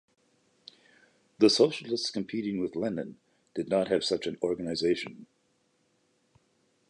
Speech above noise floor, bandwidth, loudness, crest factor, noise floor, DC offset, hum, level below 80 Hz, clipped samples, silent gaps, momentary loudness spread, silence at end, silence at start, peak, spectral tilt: 43 dB; 11 kHz; -29 LUFS; 24 dB; -72 dBFS; under 0.1%; none; -68 dBFS; under 0.1%; none; 14 LU; 1.65 s; 1.4 s; -8 dBFS; -4.5 dB/octave